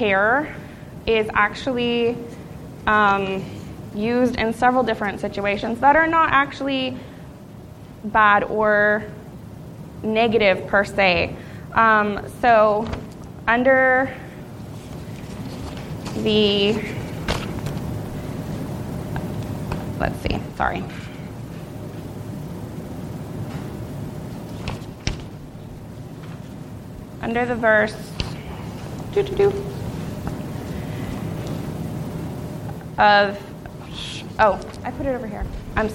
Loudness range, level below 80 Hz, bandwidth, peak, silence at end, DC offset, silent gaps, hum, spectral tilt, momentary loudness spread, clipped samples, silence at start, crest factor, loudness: 13 LU; -42 dBFS; 17 kHz; -2 dBFS; 0 s; under 0.1%; none; none; -5.5 dB/octave; 20 LU; under 0.1%; 0 s; 20 dB; -21 LUFS